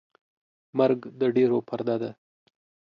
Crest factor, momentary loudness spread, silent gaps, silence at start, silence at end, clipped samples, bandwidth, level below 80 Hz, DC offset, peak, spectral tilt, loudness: 18 dB; 9 LU; none; 0.75 s; 0.85 s; under 0.1%; 5.4 kHz; -74 dBFS; under 0.1%; -10 dBFS; -9 dB/octave; -26 LUFS